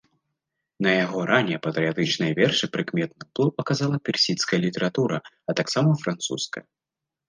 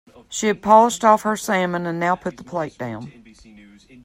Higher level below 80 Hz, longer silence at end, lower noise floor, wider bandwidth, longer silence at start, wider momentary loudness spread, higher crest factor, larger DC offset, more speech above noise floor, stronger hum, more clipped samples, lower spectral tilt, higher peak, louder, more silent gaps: second, -68 dBFS vs -58 dBFS; second, 0.65 s vs 0.95 s; first, -81 dBFS vs -47 dBFS; second, 10 kHz vs 16 kHz; first, 0.8 s vs 0.3 s; second, 7 LU vs 17 LU; about the same, 20 dB vs 20 dB; neither; first, 57 dB vs 27 dB; neither; neither; about the same, -5 dB/octave vs -4.5 dB/octave; second, -6 dBFS vs 0 dBFS; second, -24 LUFS vs -19 LUFS; neither